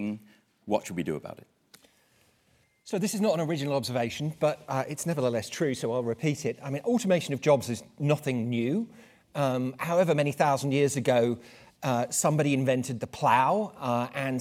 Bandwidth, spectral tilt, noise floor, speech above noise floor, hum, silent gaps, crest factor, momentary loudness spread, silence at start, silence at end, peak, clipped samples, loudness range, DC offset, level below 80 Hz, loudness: 16.5 kHz; -5.5 dB/octave; -67 dBFS; 40 dB; none; none; 20 dB; 9 LU; 0 s; 0 s; -8 dBFS; under 0.1%; 6 LU; under 0.1%; -68 dBFS; -28 LUFS